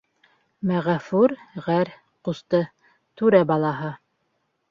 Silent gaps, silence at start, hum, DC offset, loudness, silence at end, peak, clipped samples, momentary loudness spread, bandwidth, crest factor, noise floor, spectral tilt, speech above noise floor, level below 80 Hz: none; 0.65 s; none; under 0.1%; -23 LUFS; 0.75 s; -4 dBFS; under 0.1%; 14 LU; 7.2 kHz; 20 dB; -72 dBFS; -8.5 dB/octave; 51 dB; -64 dBFS